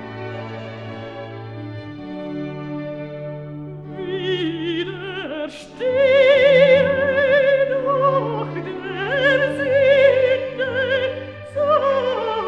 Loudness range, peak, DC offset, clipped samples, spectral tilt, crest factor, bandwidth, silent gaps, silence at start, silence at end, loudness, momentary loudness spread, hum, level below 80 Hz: 15 LU; -2 dBFS; 0.1%; under 0.1%; -6.5 dB/octave; 16 dB; 7.2 kHz; none; 0 s; 0 s; -18 LUFS; 19 LU; none; -56 dBFS